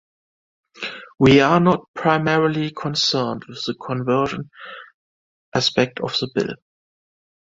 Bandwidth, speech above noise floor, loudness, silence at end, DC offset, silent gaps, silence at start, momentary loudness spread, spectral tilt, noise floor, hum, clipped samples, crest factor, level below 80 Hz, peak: 7.8 kHz; over 71 dB; -19 LUFS; 0.9 s; under 0.1%; 1.88-1.94 s, 4.94-5.52 s; 0.8 s; 17 LU; -5.5 dB/octave; under -90 dBFS; none; under 0.1%; 20 dB; -52 dBFS; -2 dBFS